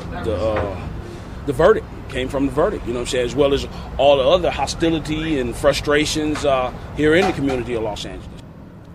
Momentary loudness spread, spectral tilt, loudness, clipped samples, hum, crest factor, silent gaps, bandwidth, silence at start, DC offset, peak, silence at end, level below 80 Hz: 14 LU; -5 dB/octave; -19 LUFS; under 0.1%; none; 18 dB; none; 15.5 kHz; 0 s; under 0.1%; -2 dBFS; 0 s; -34 dBFS